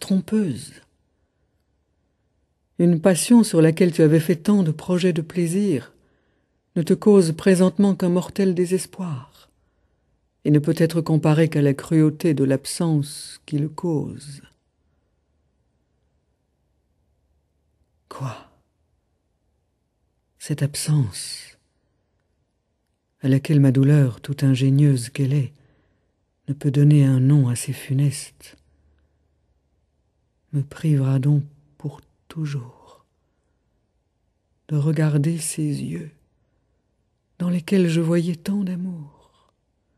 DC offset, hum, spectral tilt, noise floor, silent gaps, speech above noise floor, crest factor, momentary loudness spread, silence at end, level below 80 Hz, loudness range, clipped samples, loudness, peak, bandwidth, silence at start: under 0.1%; none; -7 dB/octave; -72 dBFS; none; 52 dB; 20 dB; 17 LU; 0.9 s; -62 dBFS; 13 LU; under 0.1%; -20 LUFS; -2 dBFS; 13 kHz; 0 s